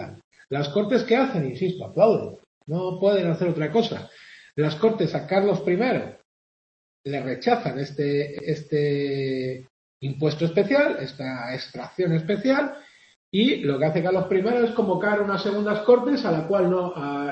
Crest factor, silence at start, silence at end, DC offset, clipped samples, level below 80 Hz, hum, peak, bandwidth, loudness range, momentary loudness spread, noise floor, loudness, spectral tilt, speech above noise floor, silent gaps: 18 dB; 0 s; 0 s; under 0.1%; under 0.1%; -66 dBFS; none; -4 dBFS; 8.2 kHz; 4 LU; 11 LU; under -90 dBFS; -23 LUFS; -7.5 dB/octave; over 67 dB; 0.24-0.31 s, 2.47-2.61 s, 6.25-7.04 s, 9.70-10.01 s, 13.16-13.32 s